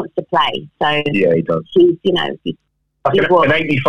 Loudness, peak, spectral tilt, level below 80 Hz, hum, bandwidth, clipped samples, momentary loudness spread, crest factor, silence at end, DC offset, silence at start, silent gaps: -15 LUFS; -2 dBFS; -7 dB/octave; -50 dBFS; none; 6.6 kHz; under 0.1%; 9 LU; 14 dB; 0 s; 1%; 0 s; none